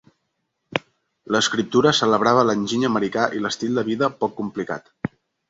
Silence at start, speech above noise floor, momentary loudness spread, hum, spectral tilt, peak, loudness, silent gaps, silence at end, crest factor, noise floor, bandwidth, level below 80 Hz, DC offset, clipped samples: 0.7 s; 55 dB; 13 LU; none; -4.5 dB/octave; -2 dBFS; -21 LUFS; none; 0.45 s; 20 dB; -75 dBFS; 8 kHz; -60 dBFS; under 0.1%; under 0.1%